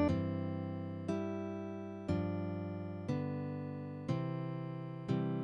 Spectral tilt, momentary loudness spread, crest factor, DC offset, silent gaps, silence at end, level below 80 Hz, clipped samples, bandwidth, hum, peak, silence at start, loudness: -9 dB/octave; 7 LU; 18 dB; under 0.1%; none; 0 s; -62 dBFS; under 0.1%; 8.6 kHz; none; -20 dBFS; 0 s; -40 LUFS